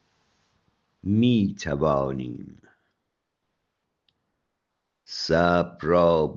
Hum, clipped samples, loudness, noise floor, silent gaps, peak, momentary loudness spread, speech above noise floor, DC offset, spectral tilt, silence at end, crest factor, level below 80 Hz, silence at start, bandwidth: none; under 0.1%; -23 LUFS; -80 dBFS; none; -6 dBFS; 16 LU; 58 dB; under 0.1%; -7 dB/octave; 0 s; 20 dB; -52 dBFS; 1.05 s; 7.4 kHz